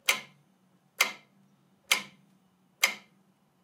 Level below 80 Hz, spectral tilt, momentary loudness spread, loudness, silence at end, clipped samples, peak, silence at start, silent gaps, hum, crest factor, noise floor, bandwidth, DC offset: -84 dBFS; 1.5 dB/octave; 18 LU; -29 LUFS; 0.65 s; under 0.1%; -6 dBFS; 0.05 s; none; none; 28 dB; -67 dBFS; 16 kHz; under 0.1%